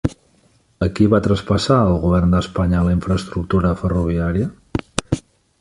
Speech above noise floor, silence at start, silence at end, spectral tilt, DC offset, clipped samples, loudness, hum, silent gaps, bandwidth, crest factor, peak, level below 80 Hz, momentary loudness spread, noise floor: 40 dB; 0.05 s; 0.4 s; -7 dB/octave; under 0.1%; under 0.1%; -18 LUFS; none; none; 11.5 kHz; 18 dB; -2 dBFS; -30 dBFS; 9 LU; -57 dBFS